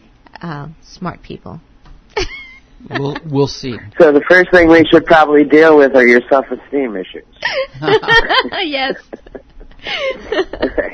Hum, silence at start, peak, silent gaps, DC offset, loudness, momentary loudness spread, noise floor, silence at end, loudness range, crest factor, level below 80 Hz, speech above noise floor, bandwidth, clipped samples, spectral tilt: none; 0.4 s; 0 dBFS; none; under 0.1%; -11 LUFS; 20 LU; -35 dBFS; 0 s; 14 LU; 14 dB; -36 dBFS; 23 dB; 8.4 kHz; 0.5%; -5.5 dB/octave